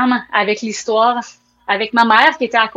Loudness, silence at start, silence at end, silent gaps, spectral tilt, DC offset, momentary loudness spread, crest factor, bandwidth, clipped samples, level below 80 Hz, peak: -14 LUFS; 0 s; 0.05 s; none; -3 dB/octave; under 0.1%; 10 LU; 16 dB; 9.2 kHz; under 0.1%; -62 dBFS; 0 dBFS